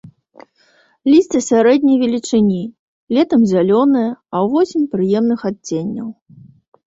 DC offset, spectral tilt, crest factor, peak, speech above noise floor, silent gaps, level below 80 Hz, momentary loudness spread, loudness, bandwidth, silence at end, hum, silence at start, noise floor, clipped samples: under 0.1%; -6 dB/octave; 14 dB; -2 dBFS; 41 dB; 2.79-3.07 s; -56 dBFS; 10 LU; -15 LUFS; 8 kHz; 0.75 s; none; 1.05 s; -55 dBFS; under 0.1%